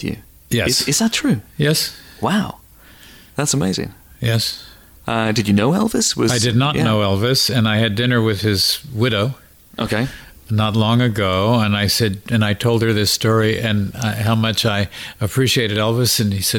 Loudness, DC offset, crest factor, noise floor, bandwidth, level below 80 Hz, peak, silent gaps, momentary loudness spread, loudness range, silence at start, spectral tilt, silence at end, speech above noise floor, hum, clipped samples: -17 LUFS; under 0.1%; 12 dB; -44 dBFS; 18.5 kHz; -44 dBFS; -6 dBFS; none; 9 LU; 5 LU; 0 s; -4.5 dB/octave; 0 s; 27 dB; none; under 0.1%